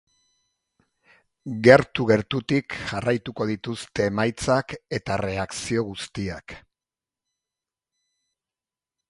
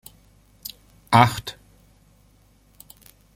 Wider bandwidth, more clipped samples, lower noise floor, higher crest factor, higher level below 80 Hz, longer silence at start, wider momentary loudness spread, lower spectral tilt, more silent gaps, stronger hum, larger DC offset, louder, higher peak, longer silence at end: second, 11.5 kHz vs 16.5 kHz; neither; first, under -90 dBFS vs -57 dBFS; about the same, 26 dB vs 26 dB; about the same, -52 dBFS vs -54 dBFS; first, 1.45 s vs 1.1 s; second, 15 LU vs 21 LU; about the same, -5.5 dB/octave vs -5 dB/octave; neither; second, none vs 50 Hz at -55 dBFS; neither; second, -23 LUFS vs -19 LUFS; about the same, 0 dBFS vs 0 dBFS; first, 2.5 s vs 1.85 s